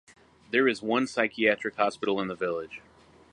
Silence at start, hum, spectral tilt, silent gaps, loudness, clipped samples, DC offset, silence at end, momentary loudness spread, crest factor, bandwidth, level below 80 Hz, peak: 0.5 s; none; -4.5 dB/octave; none; -27 LUFS; under 0.1%; under 0.1%; 0.55 s; 9 LU; 22 dB; 11 kHz; -68 dBFS; -8 dBFS